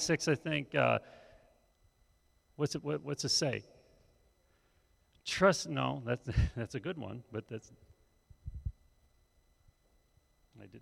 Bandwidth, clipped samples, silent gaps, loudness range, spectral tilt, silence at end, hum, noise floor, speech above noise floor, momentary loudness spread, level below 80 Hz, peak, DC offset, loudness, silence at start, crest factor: 14.5 kHz; under 0.1%; none; 14 LU; -4.5 dB/octave; 0 s; none; -71 dBFS; 37 dB; 17 LU; -50 dBFS; -14 dBFS; under 0.1%; -34 LUFS; 0 s; 24 dB